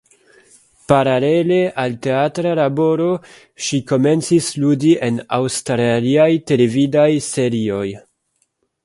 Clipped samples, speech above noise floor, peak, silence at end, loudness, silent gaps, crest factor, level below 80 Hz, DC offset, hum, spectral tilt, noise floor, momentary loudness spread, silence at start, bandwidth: under 0.1%; 51 dB; 0 dBFS; 0.85 s; -16 LUFS; none; 16 dB; -56 dBFS; under 0.1%; none; -5.5 dB/octave; -67 dBFS; 7 LU; 0.9 s; 11.5 kHz